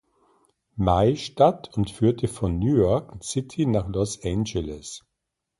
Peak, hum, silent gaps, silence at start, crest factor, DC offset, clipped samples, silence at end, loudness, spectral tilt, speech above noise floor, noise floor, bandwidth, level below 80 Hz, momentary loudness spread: -6 dBFS; none; none; 0.75 s; 18 dB; under 0.1%; under 0.1%; 0.6 s; -24 LUFS; -6.5 dB/octave; 59 dB; -82 dBFS; 11.5 kHz; -40 dBFS; 12 LU